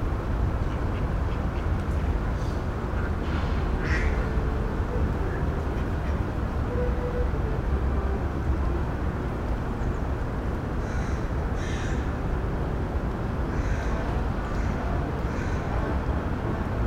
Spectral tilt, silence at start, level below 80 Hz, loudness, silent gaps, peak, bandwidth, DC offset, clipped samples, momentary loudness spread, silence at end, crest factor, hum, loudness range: -7.5 dB/octave; 0 s; -30 dBFS; -29 LUFS; none; -14 dBFS; 9.4 kHz; under 0.1%; under 0.1%; 2 LU; 0 s; 14 dB; none; 2 LU